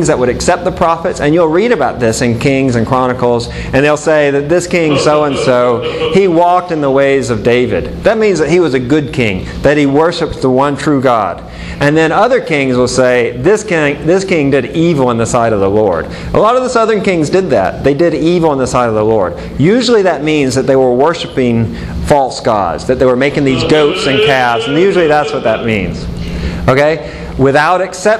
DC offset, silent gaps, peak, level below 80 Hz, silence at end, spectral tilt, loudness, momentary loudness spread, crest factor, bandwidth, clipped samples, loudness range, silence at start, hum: under 0.1%; none; 0 dBFS; -32 dBFS; 0 s; -5.5 dB/octave; -11 LUFS; 5 LU; 10 dB; 13 kHz; 0.2%; 1 LU; 0 s; none